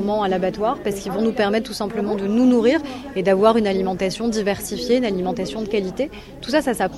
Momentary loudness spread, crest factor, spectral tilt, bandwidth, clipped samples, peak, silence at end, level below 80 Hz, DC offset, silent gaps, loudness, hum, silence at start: 9 LU; 18 dB; -5.5 dB/octave; 14 kHz; under 0.1%; -2 dBFS; 0 s; -46 dBFS; under 0.1%; none; -20 LUFS; none; 0 s